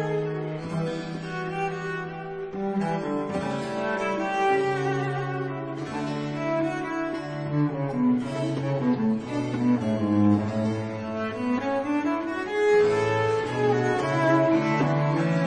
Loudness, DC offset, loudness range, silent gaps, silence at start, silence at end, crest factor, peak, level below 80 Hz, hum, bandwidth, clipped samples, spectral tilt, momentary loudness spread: -26 LUFS; under 0.1%; 6 LU; none; 0 s; 0 s; 16 dB; -10 dBFS; -60 dBFS; none; 10 kHz; under 0.1%; -7 dB/octave; 9 LU